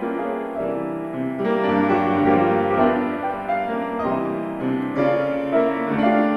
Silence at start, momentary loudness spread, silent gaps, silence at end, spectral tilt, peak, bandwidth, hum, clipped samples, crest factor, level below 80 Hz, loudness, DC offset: 0 s; 8 LU; none; 0 s; -8.5 dB/octave; -6 dBFS; 12 kHz; none; under 0.1%; 16 dB; -54 dBFS; -21 LUFS; under 0.1%